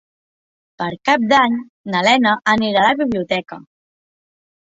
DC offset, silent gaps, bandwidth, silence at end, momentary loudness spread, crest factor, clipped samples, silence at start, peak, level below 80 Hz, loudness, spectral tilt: under 0.1%; 1.69-1.84 s; 8 kHz; 1.15 s; 12 LU; 18 dB; under 0.1%; 0.8 s; -2 dBFS; -58 dBFS; -16 LUFS; -4.5 dB/octave